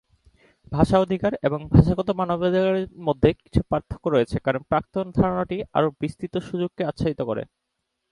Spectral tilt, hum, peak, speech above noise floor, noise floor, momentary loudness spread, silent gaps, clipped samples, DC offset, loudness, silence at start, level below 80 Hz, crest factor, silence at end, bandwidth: -8.5 dB/octave; none; 0 dBFS; 56 dB; -79 dBFS; 10 LU; none; under 0.1%; under 0.1%; -23 LUFS; 0.7 s; -40 dBFS; 22 dB; 0.65 s; 11.5 kHz